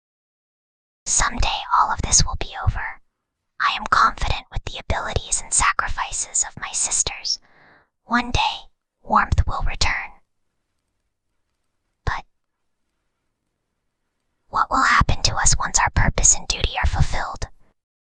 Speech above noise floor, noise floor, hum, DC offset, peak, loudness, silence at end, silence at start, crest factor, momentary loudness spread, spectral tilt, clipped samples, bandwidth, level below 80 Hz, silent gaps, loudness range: 57 dB; -77 dBFS; none; under 0.1%; -2 dBFS; -20 LUFS; 0.65 s; 1.05 s; 22 dB; 13 LU; -2 dB/octave; under 0.1%; 10 kHz; -30 dBFS; none; 18 LU